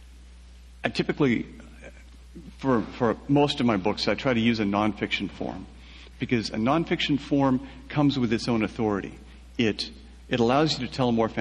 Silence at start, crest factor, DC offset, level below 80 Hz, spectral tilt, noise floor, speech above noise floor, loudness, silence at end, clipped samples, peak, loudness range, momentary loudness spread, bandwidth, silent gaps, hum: 0 s; 18 dB; under 0.1%; -48 dBFS; -6 dB/octave; -47 dBFS; 22 dB; -26 LUFS; 0 s; under 0.1%; -8 dBFS; 2 LU; 16 LU; 10.5 kHz; none; none